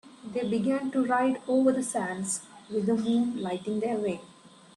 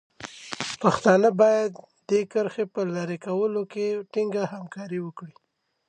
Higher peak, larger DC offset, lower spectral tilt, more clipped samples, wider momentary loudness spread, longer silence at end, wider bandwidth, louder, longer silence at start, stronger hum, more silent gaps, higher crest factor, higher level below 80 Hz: second, -12 dBFS vs -6 dBFS; neither; about the same, -5 dB/octave vs -5.5 dB/octave; neither; second, 9 LU vs 18 LU; second, 0.3 s vs 0.6 s; first, 12.5 kHz vs 9.6 kHz; second, -28 LUFS vs -25 LUFS; second, 0.05 s vs 0.2 s; neither; neither; about the same, 16 dB vs 20 dB; about the same, -70 dBFS vs -68 dBFS